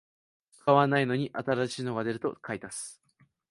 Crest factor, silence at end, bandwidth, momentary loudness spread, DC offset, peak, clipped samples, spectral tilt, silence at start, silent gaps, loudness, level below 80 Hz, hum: 22 dB; 0.6 s; 11.5 kHz; 15 LU; under 0.1%; -8 dBFS; under 0.1%; -5.5 dB/octave; 0.65 s; none; -29 LUFS; -70 dBFS; none